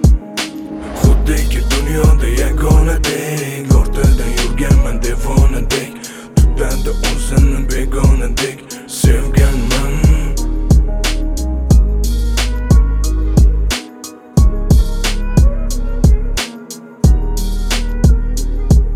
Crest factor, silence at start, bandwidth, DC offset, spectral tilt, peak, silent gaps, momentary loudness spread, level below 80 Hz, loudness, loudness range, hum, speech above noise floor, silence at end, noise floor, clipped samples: 12 dB; 0 s; 15.5 kHz; under 0.1%; -5.5 dB/octave; 0 dBFS; none; 9 LU; -14 dBFS; -15 LUFS; 2 LU; none; 20 dB; 0 s; -33 dBFS; under 0.1%